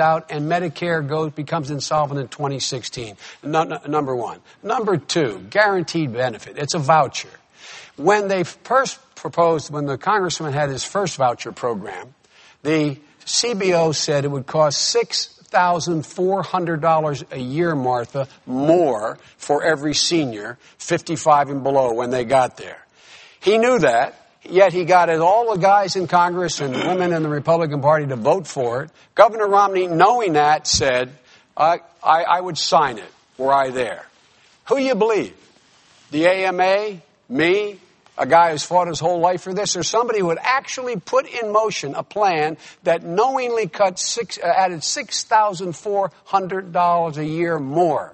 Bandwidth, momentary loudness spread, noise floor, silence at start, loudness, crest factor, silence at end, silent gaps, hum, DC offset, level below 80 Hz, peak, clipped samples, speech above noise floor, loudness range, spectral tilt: 8.8 kHz; 11 LU; -54 dBFS; 0 s; -19 LUFS; 20 dB; 0 s; none; none; under 0.1%; -56 dBFS; 0 dBFS; under 0.1%; 35 dB; 5 LU; -4 dB/octave